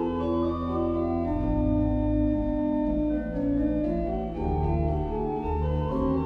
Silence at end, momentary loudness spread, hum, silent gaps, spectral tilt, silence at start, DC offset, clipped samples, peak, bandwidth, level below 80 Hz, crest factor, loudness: 0 s; 4 LU; none; none; -11 dB/octave; 0 s; under 0.1%; under 0.1%; -14 dBFS; 5 kHz; -34 dBFS; 12 dB; -27 LUFS